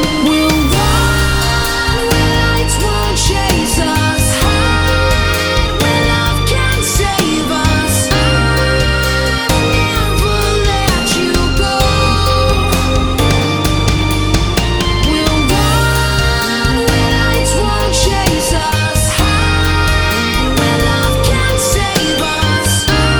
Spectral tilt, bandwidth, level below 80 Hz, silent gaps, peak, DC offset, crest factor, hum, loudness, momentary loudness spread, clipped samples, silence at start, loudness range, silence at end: -4 dB/octave; over 20 kHz; -18 dBFS; none; 0 dBFS; under 0.1%; 12 dB; none; -12 LUFS; 2 LU; under 0.1%; 0 s; 0 LU; 0 s